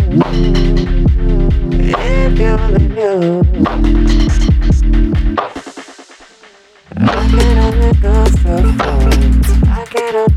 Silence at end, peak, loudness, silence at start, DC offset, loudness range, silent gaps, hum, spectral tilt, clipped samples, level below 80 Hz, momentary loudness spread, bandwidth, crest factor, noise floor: 0 s; 0 dBFS; -13 LUFS; 0 s; under 0.1%; 3 LU; none; none; -7 dB/octave; under 0.1%; -12 dBFS; 4 LU; 12.5 kHz; 10 dB; -43 dBFS